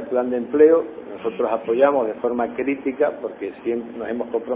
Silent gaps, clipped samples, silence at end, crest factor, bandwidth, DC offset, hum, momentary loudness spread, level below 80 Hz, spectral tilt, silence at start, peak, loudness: none; under 0.1%; 0 s; 18 dB; 3.7 kHz; under 0.1%; none; 14 LU; -60 dBFS; -10 dB/octave; 0 s; -2 dBFS; -21 LUFS